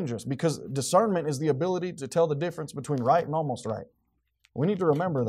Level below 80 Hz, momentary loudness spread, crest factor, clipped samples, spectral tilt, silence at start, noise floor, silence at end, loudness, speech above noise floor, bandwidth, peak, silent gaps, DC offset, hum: -68 dBFS; 9 LU; 18 dB; under 0.1%; -6 dB/octave; 0 s; -69 dBFS; 0 s; -27 LUFS; 42 dB; 15 kHz; -10 dBFS; none; under 0.1%; none